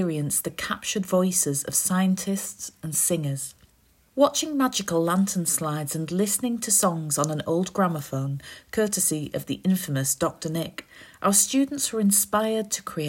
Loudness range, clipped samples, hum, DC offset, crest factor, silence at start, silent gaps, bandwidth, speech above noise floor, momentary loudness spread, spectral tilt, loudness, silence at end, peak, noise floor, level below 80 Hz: 2 LU; under 0.1%; none; under 0.1%; 20 dB; 0 s; none; 16.5 kHz; 36 dB; 10 LU; -4 dB/octave; -24 LUFS; 0 s; -6 dBFS; -61 dBFS; -62 dBFS